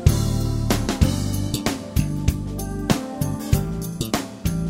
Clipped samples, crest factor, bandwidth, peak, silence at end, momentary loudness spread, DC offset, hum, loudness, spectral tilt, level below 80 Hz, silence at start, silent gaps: under 0.1%; 22 dB; 16.5 kHz; 0 dBFS; 0 s; 6 LU; under 0.1%; none; -24 LUFS; -5.5 dB/octave; -30 dBFS; 0 s; none